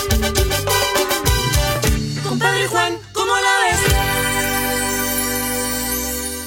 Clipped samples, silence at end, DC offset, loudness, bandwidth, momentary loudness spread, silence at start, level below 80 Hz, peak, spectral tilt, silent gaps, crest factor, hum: under 0.1%; 0 s; under 0.1%; -17 LUFS; 16.5 kHz; 5 LU; 0 s; -28 dBFS; 0 dBFS; -3 dB/octave; none; 18 dB; none